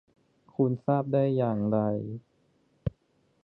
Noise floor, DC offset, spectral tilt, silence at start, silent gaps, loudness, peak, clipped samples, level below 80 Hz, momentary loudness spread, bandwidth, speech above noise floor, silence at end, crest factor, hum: -69 dBFS; under 0.1%; -12 dB/octave; 0.6 s; none; -28 LUFS; -12 dBFS; under 0.1%; -54 dBFS; 14 LU; 4.3 kHz; 43 dB; 0.55 s; 18 dB; none